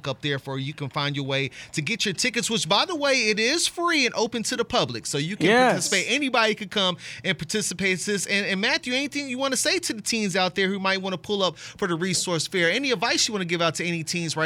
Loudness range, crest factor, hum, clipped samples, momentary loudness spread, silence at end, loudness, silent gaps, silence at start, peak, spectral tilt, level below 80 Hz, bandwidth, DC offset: 2 LU; 18 dB; none; under 0.1%; 7 LU; 0 s; -23 LUFS; none; 0.05 s; -6 dBFS; -3 dB/octave; -62 dBFS; 16.5 kHz; under 0.1%